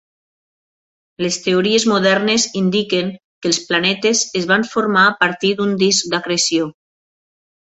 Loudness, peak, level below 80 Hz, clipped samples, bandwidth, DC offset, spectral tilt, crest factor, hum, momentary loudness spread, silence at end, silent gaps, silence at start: -16 LUFS; 0 dBFS; -60 dBFS; under 0.1%; 8.2 kHz; under 0.1%; -3 dB/octave; 18 dB; none; 7 LU; 1 s; 3.24-3.41 s; 1.2 s